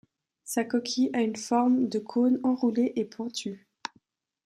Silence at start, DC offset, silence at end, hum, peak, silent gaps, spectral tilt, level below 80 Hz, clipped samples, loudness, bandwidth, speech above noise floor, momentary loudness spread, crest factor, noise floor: 0.45 s; under 0.1%; 0.9 s; none; -12 dBFS; none; -4.5 dB/octave; -78 dBFS; under 0.1%; -27 LUFS; 14.5 kHz; 41 dB; 16 LU; 16 dB; -67 dBFS